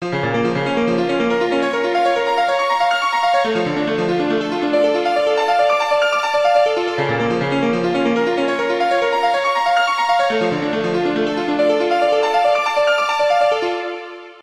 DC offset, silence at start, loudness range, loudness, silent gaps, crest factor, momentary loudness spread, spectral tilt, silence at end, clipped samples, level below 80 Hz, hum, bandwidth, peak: under 0.1%; 0 s; 1 LU; -17 LUFS; none; 12 dB; 4 LU; -5 dB/octave; 0 s; under 0.1%; -58 dBFS; none; 13.5 kHz; -4 dBFS